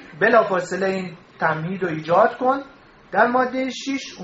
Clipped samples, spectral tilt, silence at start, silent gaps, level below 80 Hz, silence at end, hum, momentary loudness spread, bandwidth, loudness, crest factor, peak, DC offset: under 0.1%; -3.5 dB/octave; 0 s; none; -62 dBFS; 0 s; none; 10 LU; 8 kHz; -21 LUFS; 20 dB; 0 dBFS; under 0.1%